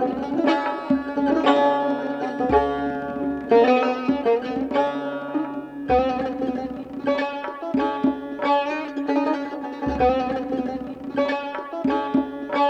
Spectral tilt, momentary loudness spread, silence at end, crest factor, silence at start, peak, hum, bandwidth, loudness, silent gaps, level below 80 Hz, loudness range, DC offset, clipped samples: -6.5 dB/octave; 10 LU; 0 s; 18 dB; 0 s; -4 dBFS; none; 7.8 kHz; -23 LUFS; none; -48 dBFS; 4 LU; under 0.1%; under 0.1%